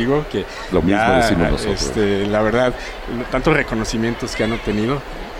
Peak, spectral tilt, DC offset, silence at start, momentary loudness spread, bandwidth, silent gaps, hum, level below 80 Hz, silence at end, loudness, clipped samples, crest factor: -4 dBFS; -5.5 dB/octave; under 0.1%; 0 s; 10 LU; 16 kHz; none; none; -30 dBFS; 0 s; -19 LUFS; under 0.1%; 16 dB